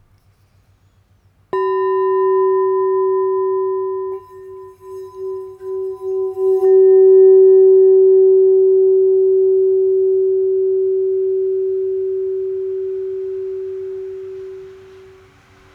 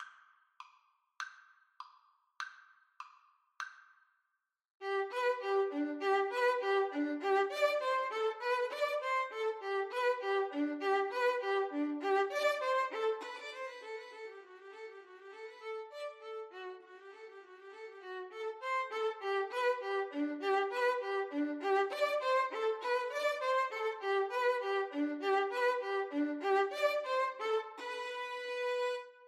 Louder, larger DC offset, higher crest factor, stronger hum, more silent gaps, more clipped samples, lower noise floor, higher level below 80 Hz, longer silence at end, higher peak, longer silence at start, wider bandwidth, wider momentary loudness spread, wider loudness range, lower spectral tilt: first, -14 LUFS vs -35 LUFS; neither; second, 12 dB vs 18 dB; neither; second, none vs 4.70-4.74 s; neither; second, -55 dBFS vs -85 dBFS; first, -62 dBFS vs under -90 dBFS; first, 1 s vs 0 s; first, -4 dBFS vs -18 dBFS; first, 1.55 s vs 0 s; second, 3 kHz vs 13.5 kHz; about the same, 19 LU vs 18 LU; about the same, 13 LU vs 14 LU; first, -8.5 dB/octave vs -1.5 dB/octave